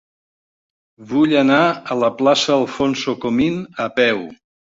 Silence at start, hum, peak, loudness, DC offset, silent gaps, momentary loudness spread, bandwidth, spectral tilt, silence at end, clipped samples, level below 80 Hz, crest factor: 1 s; none; -2 dBFS; -17 LUFS; under 0.1%; none; 9 LU; 7.8 kHz; -5 dB/octave; 0.45 s; under 0.1%; -56 dBFS; 16 dB